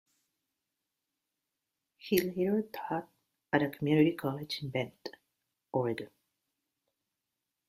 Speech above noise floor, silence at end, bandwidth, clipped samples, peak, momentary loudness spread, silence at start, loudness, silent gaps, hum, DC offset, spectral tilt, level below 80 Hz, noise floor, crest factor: 56 dB; 1.65 s; 15.5 kHz; under 0.1%; -12 dBFS; 15 LU; 2.05 s; -33 LUFS; none; none; under 0.1%; -6.5 dB/octave; -72 dBFS; -87 dBFS; 24 dB